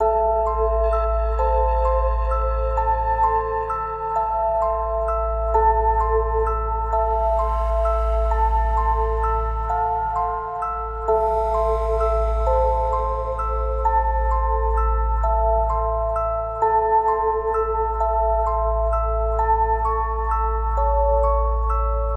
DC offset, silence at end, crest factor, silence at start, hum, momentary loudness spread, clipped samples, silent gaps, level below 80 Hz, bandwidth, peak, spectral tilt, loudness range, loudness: under 0.1%; 0 s; 14 dB; 0 s; none; 4 LU; under 0.1%; none; -24 dBFS; 3.8 kHz; -6 dBFS; -8 dB/octave; 1 LU; -21 LUFS